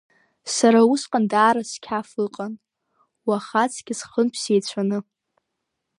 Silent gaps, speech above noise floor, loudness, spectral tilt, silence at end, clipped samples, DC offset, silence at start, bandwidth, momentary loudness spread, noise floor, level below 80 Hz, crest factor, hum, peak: none; 58 dB; -21 LUFS; -4 dB/octave; 1 s; under 0.1%; under 0.1%; 0.45 s; 11.5 kHz; 14 LU; -79 dBFS; -72 dBFS; 20 dB; none; -4 dBFS